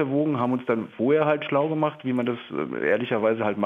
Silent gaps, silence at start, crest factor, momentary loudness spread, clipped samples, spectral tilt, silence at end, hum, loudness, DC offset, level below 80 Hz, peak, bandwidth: none; 0 s; 16 dB; 6 LU; under 0.1%; -9 dB/octave; 0 s; none; -24 LUFS; under 0.1%; -72 dBFS; -8 dBFS; 4 kHz